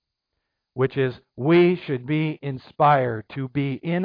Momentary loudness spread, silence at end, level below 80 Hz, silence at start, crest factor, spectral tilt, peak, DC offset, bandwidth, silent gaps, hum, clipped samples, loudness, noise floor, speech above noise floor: 13 LU; 0 s; -64 dBFS; 0.75 s; 16 dB; -10.5 dB/octave; -8 dBFS; under 0.1%; 5.2 kHz; none; none; under 0.1%; -22 LUFS; -80 dBFS; 58 dB